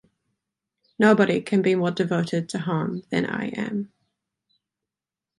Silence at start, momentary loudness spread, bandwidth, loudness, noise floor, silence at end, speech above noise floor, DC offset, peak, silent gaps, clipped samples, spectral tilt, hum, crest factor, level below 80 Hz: 1 s; 10 LU; 11.5 kHz; -23 LUFS; -89 dBFS; 1.55 s; 67 dB; under 0.1%; -6 dBFS; none; under 0.1%; -6.5 dB/octave; none; 20 dB; -66 dBFS